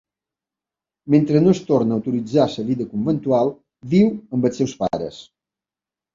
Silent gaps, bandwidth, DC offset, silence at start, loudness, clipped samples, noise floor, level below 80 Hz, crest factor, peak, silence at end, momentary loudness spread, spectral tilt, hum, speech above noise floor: none; 7.6 kHz; under 0.1%; 1.05 s; -19 LUFS; under 0.1%; -90 dBFS; -56 dBFS; 18 dB; -2 dBFS; 0.9 s; 8 LU; -8 dB/octave; none; 71 dB